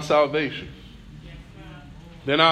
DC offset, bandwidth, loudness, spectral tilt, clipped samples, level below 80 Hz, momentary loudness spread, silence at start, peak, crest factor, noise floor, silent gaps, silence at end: under 0.1%; 12 kHz; -23 LUFS; -5 dB/octave; under 0.1%; -48 dBFS; 24 LU; 0 s; -4 dBFS; 22 dB; -43 dBFS; none; 0 s